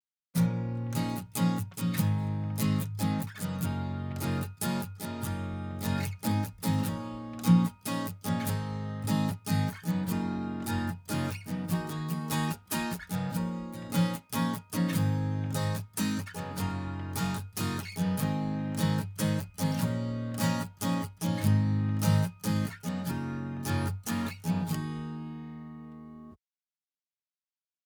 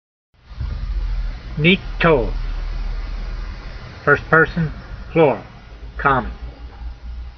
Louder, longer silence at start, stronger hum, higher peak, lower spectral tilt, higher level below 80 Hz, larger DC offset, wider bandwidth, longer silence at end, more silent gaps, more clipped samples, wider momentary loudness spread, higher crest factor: second, -32 LUFS vs -19 LUFS; second, 0.35 s vs 0.5 s; neither; second, -12 dBFS vs 0 dBFS; first, -6 dB/octave vs -4 dB/octave; second, -60 dBFS vs -28 dBFS; neither; first, over 20 kHz vs 6.2 kHz; first, 1.5 s vs 0 s; neither; neither; second, 7 LU vs 20 LU; about the same, 20 dB vs 20 dB